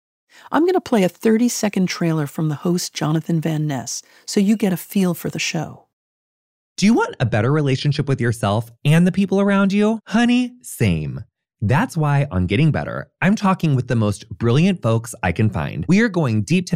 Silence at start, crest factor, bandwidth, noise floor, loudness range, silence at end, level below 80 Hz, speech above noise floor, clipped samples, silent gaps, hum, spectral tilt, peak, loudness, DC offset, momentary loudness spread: 0.5 s; 14 dB; 16 kHz; under -90 dBFS; 3 LU; 0 s; -48 dBFS; over 72 dB; under 0.1%; 5.93-6.76 s; none; -6 dB/octave; -4 dBFS; -19 LUFS; under 0.1%; 7 LU